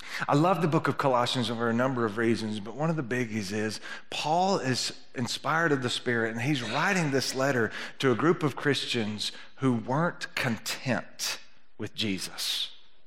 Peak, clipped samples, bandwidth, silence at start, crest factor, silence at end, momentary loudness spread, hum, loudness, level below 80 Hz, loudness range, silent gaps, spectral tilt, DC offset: -10 dBFS; under 0.1%; 16 kHz; 0 s; 18 dB; 0.3 s; 7 LU; none; -28 LUFS; -72 dBFS; 4 LU; none; -4.5 dB/octave; 0.6%